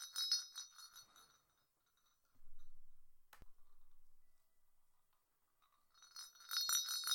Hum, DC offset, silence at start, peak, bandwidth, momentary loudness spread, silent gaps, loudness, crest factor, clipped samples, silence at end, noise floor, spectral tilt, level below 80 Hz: none; under 0.1%; 0 s; -20 dBFS; 16.5 kHz; 21 LU; none; -39 LUFS; 28 dB; under 0.1%; 0 s; -81 dBFS; 3.5 dB/octave; -66 dBFS